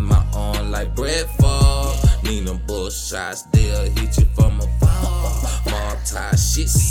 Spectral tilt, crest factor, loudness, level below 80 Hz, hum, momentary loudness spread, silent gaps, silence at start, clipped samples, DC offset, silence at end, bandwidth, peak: -5 dB/octave; 14 dB; -19 LUFS; -20 dBFS; none; 8 LU; none; 0 s; under 0.1%; under 0.1%; 0 s; 17 kHz; -4 dBFS